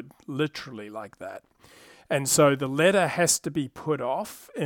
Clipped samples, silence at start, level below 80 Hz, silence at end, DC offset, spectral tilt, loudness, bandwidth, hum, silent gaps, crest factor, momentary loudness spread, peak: under 0.1%; 0 s; -64 dBFS; 0 s; under 0.1%; -3.5 dB/octave; -24 LUFS; 19 kHz; none; none; 20 dB; 19 LU; -6 dBFS